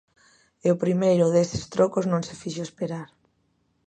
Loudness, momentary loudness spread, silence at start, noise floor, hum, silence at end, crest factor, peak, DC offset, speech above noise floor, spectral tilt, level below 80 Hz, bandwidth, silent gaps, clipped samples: -24 LUFS; 13 LU; 0.65 s; -69 dBFS; none; 0.85 s; 18 dB; -6 dBFS; under 0.1%; 46 dB; -6.5 dB/octave; -56 dBFS; 9.2 kHz; none; under 0.1%